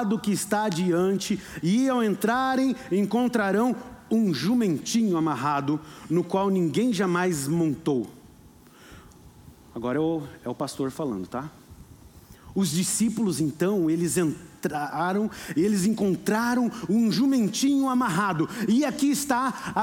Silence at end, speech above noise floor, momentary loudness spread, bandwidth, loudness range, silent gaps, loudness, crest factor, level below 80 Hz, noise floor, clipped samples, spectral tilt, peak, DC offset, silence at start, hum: 0 s; 27 dB; 7 LU; 18 kHz; 8 LU; none; -25 LUFS; 14 dB; -60 dBFS; -51 dBFS; under 0.1%; -5 dB/octave; -10 dBFS; under 0.1%; 0 s; none